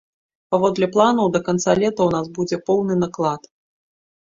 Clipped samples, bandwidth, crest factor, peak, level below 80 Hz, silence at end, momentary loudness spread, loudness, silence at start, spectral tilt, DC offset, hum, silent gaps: under 0.1%; 7.8 kHz; 18 dB; -2 dBFS; -56 dBFS; 0.95 s; 8 LU; -19 LUFS; 0.5 s; -6 dB/octave; under 0.1%; none; none